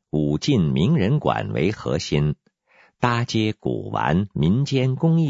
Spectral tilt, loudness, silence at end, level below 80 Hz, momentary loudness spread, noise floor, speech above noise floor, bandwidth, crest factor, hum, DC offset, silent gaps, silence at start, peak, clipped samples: -7 dB/octave; -22 LUFS; 0 s; -46 dBFS; 6 LU; -58 dBFS; 37 dB; 7.8 kHz; 18 dB; none; under 0.1%; none; 0.15 s; -2 dBFS; under 0.1%